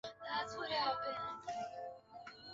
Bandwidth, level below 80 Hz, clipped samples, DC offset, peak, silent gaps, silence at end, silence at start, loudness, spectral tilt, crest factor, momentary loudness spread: 7.6 kHz; -74 dBFS; under 0.1%; under 0.1%; -24 dBFS; none; 0 s; 0.05 s; -41 LUFS; 0 dB/octave; 18 dB; 16 LU